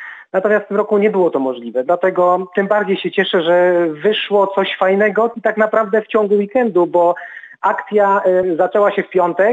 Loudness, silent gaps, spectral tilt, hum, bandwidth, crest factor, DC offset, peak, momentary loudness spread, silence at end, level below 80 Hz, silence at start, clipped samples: -15 LUFS; none; -7 dB/octave; none; 7.8 kHz; 14 dB; under 0.1%; -2 dBFS; 5 LU; 0 s; -66 dBFS; 0 s; under 0.1%